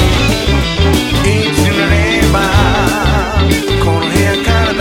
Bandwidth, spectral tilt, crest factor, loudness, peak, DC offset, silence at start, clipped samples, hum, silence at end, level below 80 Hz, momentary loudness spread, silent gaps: 17.5 kHz; -5 dB/octave; 10 dB; -11 LUFS; 0 dBFS; under 0.1%; 0 s; under 0.1%; none; 0 s; -20 dBFS; 2 LU; none